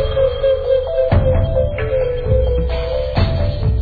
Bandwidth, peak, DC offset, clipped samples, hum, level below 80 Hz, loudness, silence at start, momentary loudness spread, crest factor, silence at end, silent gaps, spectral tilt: 4.9 kHz; -4 dBFS; under 0.1%; under 0.1%; none; -22 dBFS; -17 LUFS; 0 s; 4 LU; 12 dB; 0 s; none; -10 dB/octave